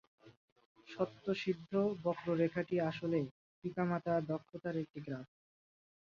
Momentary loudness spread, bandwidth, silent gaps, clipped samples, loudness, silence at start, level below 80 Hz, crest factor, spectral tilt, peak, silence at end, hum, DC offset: 11 LU; 7.2 kHz; 0.37-0.56 s, 0.66-0.75 s, 3.31-3.62 s, 4.90-4.94 s; under 0.1%; -38 LUFS; 0.25 s; -76 dBFS; 18 dB; -6.5 dB/octave; -22 dBFS; 0.85 s; none; under 0.1%